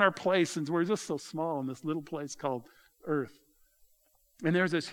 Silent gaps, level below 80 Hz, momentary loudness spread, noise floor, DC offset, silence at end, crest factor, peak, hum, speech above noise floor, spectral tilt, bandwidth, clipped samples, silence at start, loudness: none; -76 dBFS; 10 LU; -69 dBFS; under 0.1%; 0 s; 24 dB; -8 dBFS; none; 38 dB; -5 dB/octave; 17.5 kHz; under 0.1%; 0 s; -32 LUFS